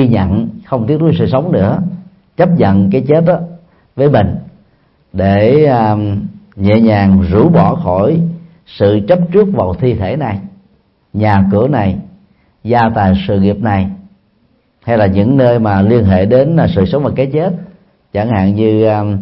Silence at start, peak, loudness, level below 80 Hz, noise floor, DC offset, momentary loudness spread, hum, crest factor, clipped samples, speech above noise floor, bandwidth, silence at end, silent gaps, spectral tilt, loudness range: 0 s; 0 dBFS; -11 LUFS; -38 dBFS; -55 dBFS; under 0.1%; 12 LU; none; 12 dB; under 0.1%; 45 dB; 5.8 kHz; 0 s; none; -11.5 dB/octave; 4 LU